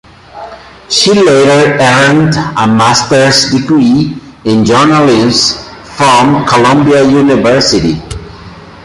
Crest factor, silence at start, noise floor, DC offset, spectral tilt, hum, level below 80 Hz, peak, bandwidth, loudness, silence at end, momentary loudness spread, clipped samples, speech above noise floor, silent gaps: 8 dB; 0.35 s; -30 dBFS; under 0.1%; -4.5 dB/octave; none; -36 dBFS; 0 dBFS; 16 kHz; -7 LUFS; 0.1 s; 14 LU; under 0.1%; 23 dB; none